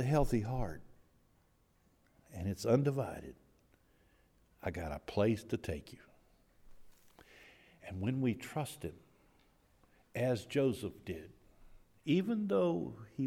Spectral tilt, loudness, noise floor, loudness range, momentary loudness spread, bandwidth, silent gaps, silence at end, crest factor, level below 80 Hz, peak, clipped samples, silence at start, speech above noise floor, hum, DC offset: -7 dB/octave; -37 LUFS; -71 dBFS; 6 LU; 16 LU; 16.5 kHz; none; 0 s; 20 dB; -54 dBFS; -18 dBFS; under 0.1%; 0 s; 36 dB; none; under 0.1%